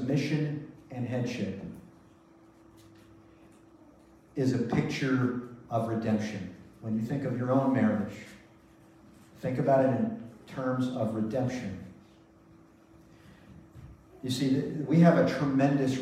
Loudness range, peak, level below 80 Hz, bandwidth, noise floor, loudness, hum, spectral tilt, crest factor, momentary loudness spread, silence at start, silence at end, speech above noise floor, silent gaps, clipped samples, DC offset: 10 LU; -8 dBFS; -64 dBFS; 14 kHz; -57 dBFS; -29 LUFS; none; -7.5 dB/octave; 22 dB; 18 LU; 0 s; 0 s; 29 dB; none; under 0.1%; under 0.1%